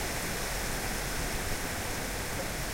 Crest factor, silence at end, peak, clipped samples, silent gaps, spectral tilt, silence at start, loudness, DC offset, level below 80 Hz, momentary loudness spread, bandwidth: 14 dB; 0 s; -20 dBFS; under 0.1%; none; -3 dB/octave; 0 s; -33 LUFS; under 0.1%; -40 dBFS; 1 LU; 16 kHz